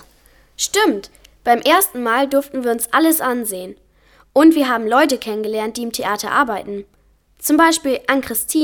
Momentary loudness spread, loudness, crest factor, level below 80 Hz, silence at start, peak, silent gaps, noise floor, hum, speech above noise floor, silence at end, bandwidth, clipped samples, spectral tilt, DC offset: 12 LU; -17 LUFS; 16 dB; -54 dBFS; 0.6 s; -2 dBFS; none; -52 dBFS; none; 36 dB; 0 s; 19 kHz; under 0.1%; -2 dB/octave; under 0.1%